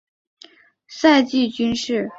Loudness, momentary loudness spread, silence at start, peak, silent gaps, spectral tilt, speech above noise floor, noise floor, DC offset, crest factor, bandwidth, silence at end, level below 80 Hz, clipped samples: -18 LUFS; 8 LU; 0.9 s; -2 dBFS; none; -4 dB/octave; 32 dB; -50 dBFS; under 0.1%; 18 dB; 8 kHz; 0 s; -56 dBFS; under 0.1%